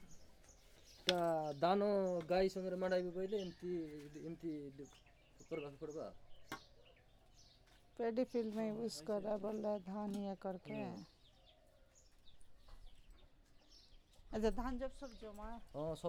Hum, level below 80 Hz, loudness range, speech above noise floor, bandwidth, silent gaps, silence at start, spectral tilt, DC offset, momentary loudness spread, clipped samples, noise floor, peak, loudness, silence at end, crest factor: none; -60 dBFS; 14 LU; 26 dB; 17 kHz; none; 0 s; -5.5 dB/octave; under 0.1%; 17 LU; under 0.1%; -68 dBFS; -14 dBFS; -42 LUFS; 0 s; 28 dB